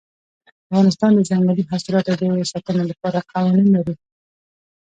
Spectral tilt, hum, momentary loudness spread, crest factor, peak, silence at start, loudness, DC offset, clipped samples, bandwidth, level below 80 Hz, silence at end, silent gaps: -7 dB/octave; none; 7 LU; 16 dB; -4 dBFS; 0.7 s; -18 LUFS; under 0.1%; under 0.1%; 9 kHz; -58 dBFS; 1 s; none